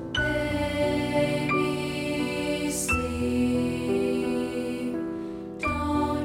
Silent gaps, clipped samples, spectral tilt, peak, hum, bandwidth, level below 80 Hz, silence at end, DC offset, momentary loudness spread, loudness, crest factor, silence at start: none; under 0.1%; -5 dB/octave; -12 dBFS; none; 16.5 kHz; -44 dBFS; 0 s; under 0.1%; 6 LU; -27 LUFS; 14 dB; 0 s